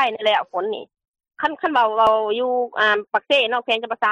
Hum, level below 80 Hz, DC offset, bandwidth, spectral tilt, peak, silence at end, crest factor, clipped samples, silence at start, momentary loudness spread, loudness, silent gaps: none; -64 dBFS; under 0.1%; 9.4 kHz; -3.5 dB/octave; -6 dBFS; 0 s; 14 dB; under 0.1%; 0 s; 9 LU; -20 LUFS; 1.08-1.12 s